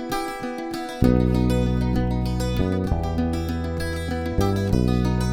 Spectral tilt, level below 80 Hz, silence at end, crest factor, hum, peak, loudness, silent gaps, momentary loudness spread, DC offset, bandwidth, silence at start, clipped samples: -7 dB/octave; -30 dBFS; 0 s; 18 dB; none; -4 dBFS; -23 LUFS; none; 8 LU; under 0.1%; 17.5 kHz; 0 s; under 0.1%